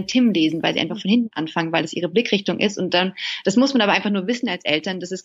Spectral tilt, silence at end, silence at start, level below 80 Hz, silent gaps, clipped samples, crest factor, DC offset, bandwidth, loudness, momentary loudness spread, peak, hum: -4.5 dB/octave; 0.05 s; 0 s; -66 dBFS; none; under 0.1%; 18 dB; under 0.1%; 8 kHz; -20 LUFS; 6 LU; -2 dBFS; none